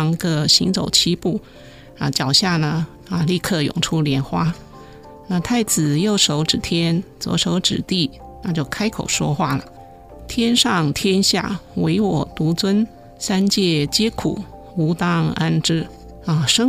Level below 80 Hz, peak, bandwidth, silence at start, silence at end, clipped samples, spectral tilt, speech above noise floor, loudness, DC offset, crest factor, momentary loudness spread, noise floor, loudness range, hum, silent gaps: -44 dBFS; 0 dBFS; 16 kHz; 0 s; 0 s; under 0.1%; -4 dB/octave; 21 dB; -19 LUFS; under 0.1%; 20 dB; 10 LU; -40 dBFS; 2 LU; none; none